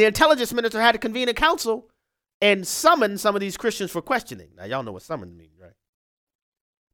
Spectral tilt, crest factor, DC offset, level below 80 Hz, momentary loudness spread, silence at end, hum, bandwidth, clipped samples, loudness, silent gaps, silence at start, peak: -3 dB/octave; 22 dB; under 0.1%; -50 dBFS; 15 LU; 1.6 s; none; 18.5 kHz; under 0.1%; -21 LUFS; 2.34-2.40 s; 0 s; -2 dBFS